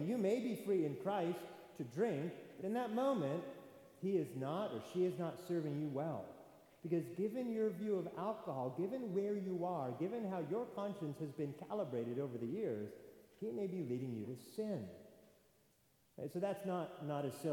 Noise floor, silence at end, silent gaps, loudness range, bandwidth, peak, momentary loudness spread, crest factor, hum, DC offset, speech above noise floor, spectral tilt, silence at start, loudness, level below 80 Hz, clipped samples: -74 dBFS; 0 s; none; 5 LU; 19 kHz; -26 dBFS; 10 LU; 16 dB; none; under 0.1%; 34 dB; -7.5 dB/octave; 0 s; -42 LUFS; -86 dBFS; under 0.1%